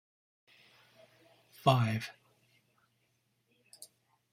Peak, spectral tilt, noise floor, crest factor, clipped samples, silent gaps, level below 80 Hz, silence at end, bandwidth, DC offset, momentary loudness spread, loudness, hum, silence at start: -12 dBFS; -6 dB/octave; -77 dBFS; 26 dB; under 0.1%; none; -74 dBFS; 0.45 s; 15.5 kHz; under 0.1%; 25 LU; -31 LUFS; none; 1.65 s